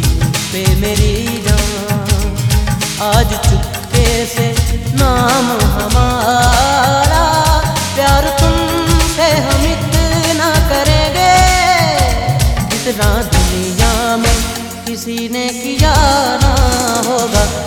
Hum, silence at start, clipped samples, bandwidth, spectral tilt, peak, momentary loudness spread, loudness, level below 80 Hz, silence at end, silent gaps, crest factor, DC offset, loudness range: none; 0 s; under 0.1%; 19.5 kHz; -4 dB/octave; 0 dBFS; 6 LU; -12 LUFS; -18 dBFS; 0 s; none; 12 dB; 0.2%; 3 LU